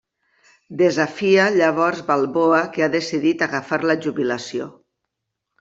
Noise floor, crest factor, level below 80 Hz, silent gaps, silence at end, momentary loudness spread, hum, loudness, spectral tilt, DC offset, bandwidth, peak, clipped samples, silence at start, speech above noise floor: -80 dBFS; 16 dB; -66 dBFS; none; 0.9 s; 9 LU; none; -19 LUFS; -5.5 dB/octave; under 0.1%; 7.8 kHz; -4 dBFS; under 0.1%; 0.7 s; 61 dB